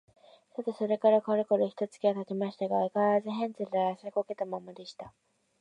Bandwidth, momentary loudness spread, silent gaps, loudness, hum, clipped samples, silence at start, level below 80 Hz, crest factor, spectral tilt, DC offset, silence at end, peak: 9.8 kHz; 18 LU; none; -30 LUFS; none; under 0.1%; 0.6 s; -80 dBFS; 18 dB; -7.5 dB/octave; under 0.1%; 0.5 s; -12 dBFS